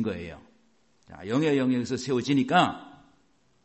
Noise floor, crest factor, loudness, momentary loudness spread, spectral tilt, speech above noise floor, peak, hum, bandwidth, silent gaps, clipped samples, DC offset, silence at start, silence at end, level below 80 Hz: -67 dBFS; 20 dB; -26 LUFS; 19 LU; -5.5 dB/octave; 41 dB; -8 dBFS; none; 8.4 kHz; none; under 0.1%; under 0.1%; 0 s; 0.75 s; -58 dBFS